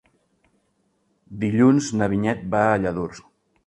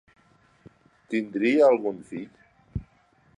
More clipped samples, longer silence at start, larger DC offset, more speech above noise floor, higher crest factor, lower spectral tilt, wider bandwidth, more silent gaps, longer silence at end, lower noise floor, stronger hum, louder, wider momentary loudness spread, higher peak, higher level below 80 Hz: neither; first, 1.3 s vs 1.1 s; neither; first, 48 dB vs 39 dB; about the same, 20 dB vs 20 dB; about the same, -6.5 dB/octave vs -7 dB/octave; about the same, 10.5 kHz vs 10.5 kHz; neither; about the same, 0.45 s vs 0.55 s; first, -68 dBFS vs -62 dBFS; neither; about the same, -21 LUFS vs -23 LUFS; second, 13 LU vs 19 LU; first, -4 dBFS vs -8 dBFS; about the same, -52 dBFS vs -52 dBFS